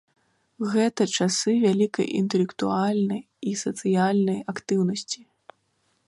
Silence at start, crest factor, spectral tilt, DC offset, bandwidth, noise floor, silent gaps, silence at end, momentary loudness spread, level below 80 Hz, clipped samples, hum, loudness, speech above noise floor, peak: 0.6 s; 16 dB; -5 dB/octave; under 0.1%; 11.5 kHz; -70 dBFS; none; 0.9 s; 9 LU; -70 dBFS; under 0.1%; none; -24 LUFS; 46 dB; -10 dBFS